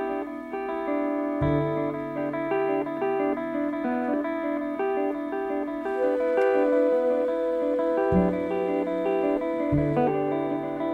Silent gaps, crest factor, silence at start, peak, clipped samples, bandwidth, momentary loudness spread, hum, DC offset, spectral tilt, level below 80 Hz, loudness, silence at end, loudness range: none; 14 dB; 0 s; -12 dBFS; under 0.1%; 8.4 kHz; 7 LU; none; under 0.1%; -9 dB/octave; -50 dBFS; -26 LUFS; 0 s; 3 LU